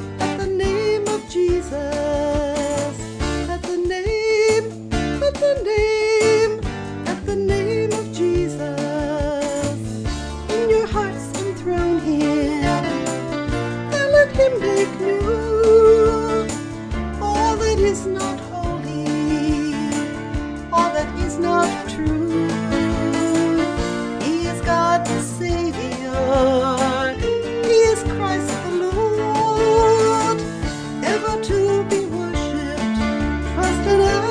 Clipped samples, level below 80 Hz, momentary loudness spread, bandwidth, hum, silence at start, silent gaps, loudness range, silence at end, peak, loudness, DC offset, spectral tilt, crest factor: under 0.1%; -32 dBFS; 9 LU; 11 kHz; none; 0 s; none; 5 LU; 0 s; -4 dBFS; -20 LUFS; under 0.1%; -5.5 dB/octave; 16 dB